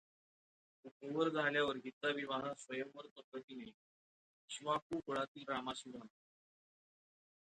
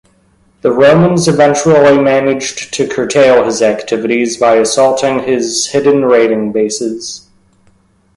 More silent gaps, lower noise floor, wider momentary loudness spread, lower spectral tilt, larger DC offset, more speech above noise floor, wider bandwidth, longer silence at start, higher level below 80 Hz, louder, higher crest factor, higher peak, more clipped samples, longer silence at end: first, 0.91-1.00 s, 1.93-2.01 s, 3.11-3.16 s, 3.24-3.32 s, 3.44-3.48 s, 3.74-4.48 s, 4.82-4.90 s, 5.28-5.35 s vs none; first, under -90 dBFS vs -51 dBFS; first, 18 LU vs 10 LU; about the same, -4 dB/octave vs -4.5 dB/octave; neither; first, over 48 dB vs 41 dB; second, 9 kHz vs 11.5 kHz; first, 0.85 s vs 0.65 s; second, -82 dBFS vs -48 dBFS; second, -41 LUFS vs -10 LUFS; first, 20 dB vs 10 dB; second, -24 dBFS vs 0 dBFS; neither; first, 1.35 s vs 1 s